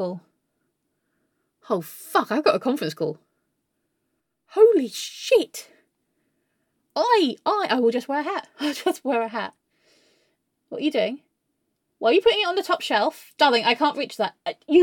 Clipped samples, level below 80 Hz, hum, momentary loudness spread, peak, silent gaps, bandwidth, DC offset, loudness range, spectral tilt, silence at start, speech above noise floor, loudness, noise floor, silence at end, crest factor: under 0.1%; -70 dBFS; none; 13 LU; -4 dBFS; none; 17.5 kHz; under 0.1%; 6 LU; -4 dB/octave; 0 s; 54 dB; -23 LUFS; -76 dBFS; 0 s; 20 dB